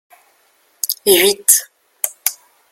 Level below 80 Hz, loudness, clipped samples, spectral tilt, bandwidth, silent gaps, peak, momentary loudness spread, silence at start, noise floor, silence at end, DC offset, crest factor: -64 dBFS; -14 LUFS; under 0.1%; -0.5 dB/octave; over 20 kHz; none; 0 dBFS; 12 LU; 0.85 s; -57 dBFS; 0.4 s; under 0.1%; 18 dB